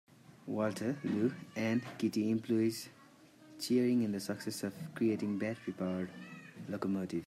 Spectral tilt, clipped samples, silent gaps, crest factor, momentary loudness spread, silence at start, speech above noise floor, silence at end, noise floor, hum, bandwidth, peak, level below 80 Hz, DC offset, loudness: -6 dB/octave; under 0.1%; none; 16 dB; 12 LU; 0.3 s; 25 dB; 0 s; -60 dBFS; none; 15 kHz; -20 dBFS; -78 dBFS; under 0.1%; -36 LUFS